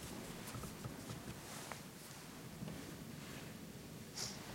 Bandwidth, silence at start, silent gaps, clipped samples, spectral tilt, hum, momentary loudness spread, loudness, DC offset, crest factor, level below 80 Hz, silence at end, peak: 16 kHz; 0 s; none; under 0.1%; -4 dB/octave; none; 7 LU; -49 LUFS; under 0.1%; 22 dB; -66 dBFS; 0 s; -28 dBFS